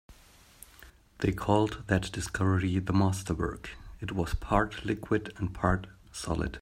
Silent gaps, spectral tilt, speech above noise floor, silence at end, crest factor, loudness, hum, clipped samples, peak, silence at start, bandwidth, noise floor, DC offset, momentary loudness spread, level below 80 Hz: none; -6 dB/octave; 28 dB; 0 s; 22 dB; -30 LUFS; none; under 0.1%; -8 dBFS; 0.1 s; 16 kHz; -57 dBFS; under 0.1%; 13 LU; -44 dBFS